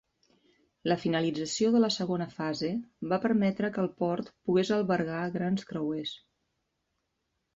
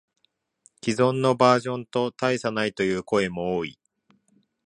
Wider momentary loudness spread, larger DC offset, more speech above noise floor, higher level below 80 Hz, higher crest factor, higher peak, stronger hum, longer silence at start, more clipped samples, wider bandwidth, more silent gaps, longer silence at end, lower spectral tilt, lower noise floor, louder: about the same, 8 LU vs 9 LU; neither; about the same, 51 dB vs 48 dB; second, -68 dBFS vs -60 dBFS; about the same, 18 dB vs 22 dB; second, -12 dBFS vs -4 dBFS; neither; about the same, 0.85 s vs 0.85 s; neither; second, 8 kHz vs 11 kHz; neither; first, 1.4 s vs 0.95 s; about the same, -5.5 dB/octave vs -5.5 dB/octave; first, -81 dBFS vs -72 dBFS; second, -30 LUFS vs -24 LUFS